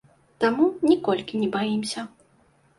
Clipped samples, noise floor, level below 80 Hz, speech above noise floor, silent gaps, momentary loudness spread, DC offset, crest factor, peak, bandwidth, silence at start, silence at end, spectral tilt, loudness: under 0.1%; -61 dBFS; -64 dBFS; 38 dB; none; 11 LU; under 0.1%; 16 dB; -8 dBFS; 11.5 kHz; 0.4 s; 0.7 s; -5 dB/octave; -24 LUFS